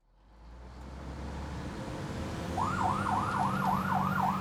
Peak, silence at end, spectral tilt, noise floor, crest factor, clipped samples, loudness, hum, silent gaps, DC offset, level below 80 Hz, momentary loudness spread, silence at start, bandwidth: -18 dBFS; 0 s; -6 dB/octave; -56 dBFS; 16 dB; under 0.1%; -33 LUFS; none; none; under 0.1%; -48 dBFS; 16 LU; 0.3 s; 16 kHz